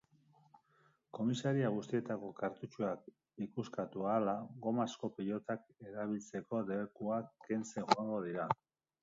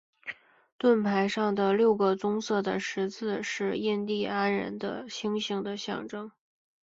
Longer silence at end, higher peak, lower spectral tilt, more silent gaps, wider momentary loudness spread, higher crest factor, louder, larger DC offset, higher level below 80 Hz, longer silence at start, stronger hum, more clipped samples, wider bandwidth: about the same, 0.5 s vs 0.55 s; about the same, -10 dBFS vs -12 dBFS; about the same, -6 dB/octave vs -5 dB/octave; second, none vs 0.72-0.79 s; second, 9 LU vs 15 LU; first, 30 dB vs 18 dB; second, -39 LUFS vs -29 LUFS; neither; second, -80 dBFS vs -70 dBFS; first, 0.55 s vs 0.25 s; neither; neither; about the same, 7.4 kHz vs 7.8 kHz